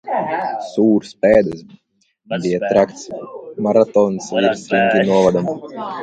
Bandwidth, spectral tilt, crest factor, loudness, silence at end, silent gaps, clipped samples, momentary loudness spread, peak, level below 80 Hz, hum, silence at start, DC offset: 9 kHz; -6 dB/octave; 16 dB; -17 LUFS; 0 s; none; under 0.1%; 14 LU; 0 dBFS; -52 dBFS; none; 0.05 s; under 0.1%